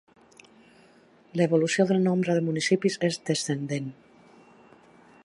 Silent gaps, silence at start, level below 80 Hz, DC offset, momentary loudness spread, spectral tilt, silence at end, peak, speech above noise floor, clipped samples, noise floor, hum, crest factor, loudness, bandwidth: none; 1.35 s; -74 dBFS; under 0.1%; 10 LU; -5.5 dB/octave; 1.35 s; -10 dBFS; 32 dB; under 0.1%; -57 dBFS; none; 18 dB; -25 LUFS; 11.5 kHz